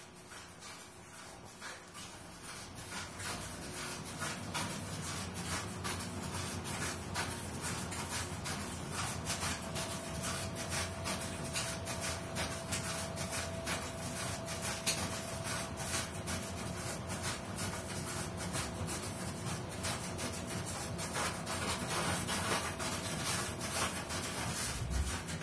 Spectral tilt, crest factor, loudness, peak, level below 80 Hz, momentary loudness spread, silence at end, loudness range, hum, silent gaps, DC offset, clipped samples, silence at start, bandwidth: -3 dB/octave; 22 dB; -38 LUFS; -18 dBFS; -54 dBFS; 11 LU; 0 s; 5 LU; none; none; under 0.1%; under 0.1%; 0 s; 11 kHz